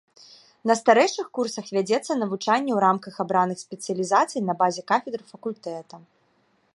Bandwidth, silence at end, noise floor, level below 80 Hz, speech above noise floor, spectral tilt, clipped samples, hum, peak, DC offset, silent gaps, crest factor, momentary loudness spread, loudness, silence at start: 11.5 kHz; 0.75 s; -66 dBFS; -76 dBFS; 42 dB; -4.5 dB/octave; under 0.1%; none; -4 dBFS; under 0.1%; none; 20 dB; 14 LU; -24 LUFS; 0.65 s